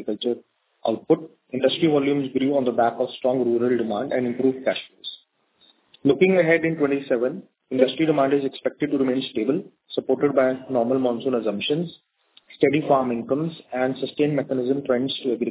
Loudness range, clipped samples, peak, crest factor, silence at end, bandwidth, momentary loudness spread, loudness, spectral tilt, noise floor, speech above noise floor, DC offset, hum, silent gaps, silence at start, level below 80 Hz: 3 LU; under 0.1%; -4 dBFS; 20 dB; 0 s; 4 kHz; 9 LU; -23 LUFS; -10.5 dB/octave; -60 dBFS; 38 dB; under 0.1%; none; none; 0 s; -66 dBFS